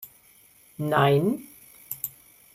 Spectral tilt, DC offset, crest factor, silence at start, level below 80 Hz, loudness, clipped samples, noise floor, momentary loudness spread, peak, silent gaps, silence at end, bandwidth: -6 dB/octave; under 0.1%; 22 dB; 0 s; -64 dBFS; -25 LUFS; under 0.1%; -56 dBFS; 25 LU; -6 dBFS; none; 0.45 s; 16.5 kHz